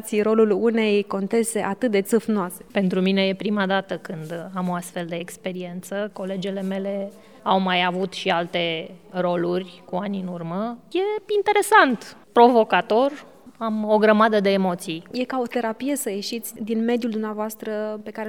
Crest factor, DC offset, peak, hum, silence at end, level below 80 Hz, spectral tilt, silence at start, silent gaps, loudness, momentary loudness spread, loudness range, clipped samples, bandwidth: 22 dB; 0.2%; 0 dBFS; none; 0 s; -70 dBFS; -5 dB/octave; 0 s; none; -22 LUFS; 14 LU; 7 LU; under 0.1%; 18 kHz